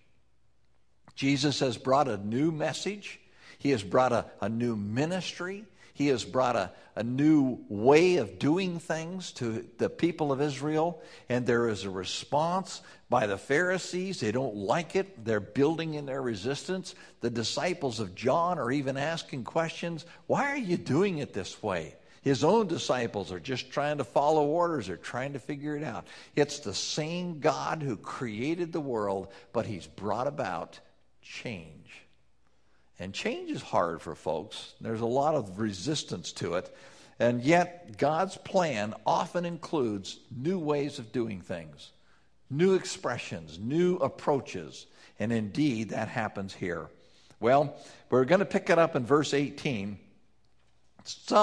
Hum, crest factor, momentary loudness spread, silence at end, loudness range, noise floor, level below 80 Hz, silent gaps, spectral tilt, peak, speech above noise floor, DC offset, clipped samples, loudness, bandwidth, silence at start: none; 22 dB; 13 LU; 0 s; 6 LU; -71 dBFS; -64 dBFS; none; -5.5 dB/octave; -8 dBFS; 42 dB; under 0.1%; under 0.1%; -30 LUFS; 11 kHz; 1.2 s